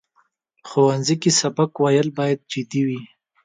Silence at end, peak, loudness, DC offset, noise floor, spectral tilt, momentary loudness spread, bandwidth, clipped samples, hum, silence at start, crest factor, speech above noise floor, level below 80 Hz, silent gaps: 0.4 s; -4 dBFS; -20 LUFS; under 0.1%; -64 dBFS; -4.5 dB/octave; 8 LU; 9.6 kHz; under 0.1%; none; 0.65 s; 16 dB; 45 dB; -66 dBFS; none